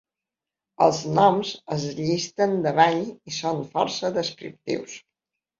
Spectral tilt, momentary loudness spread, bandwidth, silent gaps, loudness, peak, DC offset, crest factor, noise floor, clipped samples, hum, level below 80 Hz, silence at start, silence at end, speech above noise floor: -5 dB/octave; 12 LU; 7.6 kHz; none; -24 LUFS; -4 dBFS; under 0.1%; 22 dB; -88 dBFS; under 0.1%; none; -64 dBFS; 0.8 s; 0.6 s; 65 dB